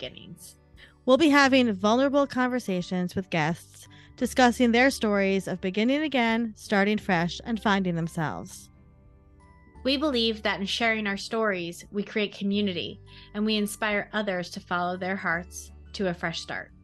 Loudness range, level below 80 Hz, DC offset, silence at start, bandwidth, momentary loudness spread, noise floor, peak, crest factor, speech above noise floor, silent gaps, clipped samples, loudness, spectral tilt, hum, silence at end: 5 LU; -54 dBFS; under 0.1%; 0 s; 12.5 kHz; 13 LU; -54 dBFS; -6 dBFS; 20 dB; 29 dB; none; under 0.1%; -26 LUFS; -5 dB/octave; none; 0.2 s